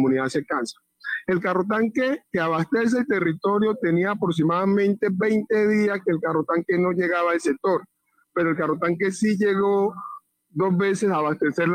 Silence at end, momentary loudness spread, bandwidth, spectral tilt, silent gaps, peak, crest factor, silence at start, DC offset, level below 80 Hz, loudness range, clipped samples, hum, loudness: 0 s; 6 LU; 14 kHz; -6.5 dB/octave; none; -12 dBFS; 10 dB; 0 s; under 0.1%; -64 dBFS; 2 LU; under 0.1%; none; -23 LUFS